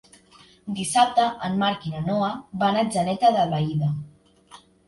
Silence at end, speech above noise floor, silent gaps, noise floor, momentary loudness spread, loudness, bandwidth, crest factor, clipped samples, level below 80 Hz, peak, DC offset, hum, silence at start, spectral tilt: 0.3 s; 31 dB; none; -53 dBFS; 9 LU; -23 LUFS; 11.5 kHz; 20 dB; under 0.1%; -58 dBFS; -4 dBFS; under 0.1%; none; 0.65 s; -5.5 dB/octave